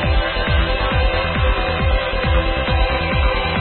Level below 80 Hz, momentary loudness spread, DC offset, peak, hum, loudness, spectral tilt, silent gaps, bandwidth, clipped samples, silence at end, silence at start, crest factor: -20 dBFS; 1 LU; under 0.1%; -6 dBFS; none; -18 LUFS; -11 dB/octave; none; 4.4 kHz; under 0.1%; 0 s; 0 s; 12 dB